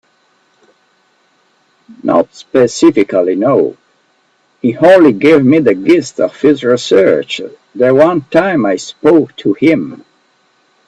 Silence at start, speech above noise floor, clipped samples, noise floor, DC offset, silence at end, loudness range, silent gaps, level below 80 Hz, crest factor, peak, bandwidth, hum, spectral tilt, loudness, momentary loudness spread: 2.05 s; 46 dB; 0.2%; -56 dBFS; under 0.1%; 0.9 s; 4 LU; none; -54 dBFS; 12 dB; 0 dBFS; 9 kHz; none; -6 dB/octave; -11 LUFS; 10 LU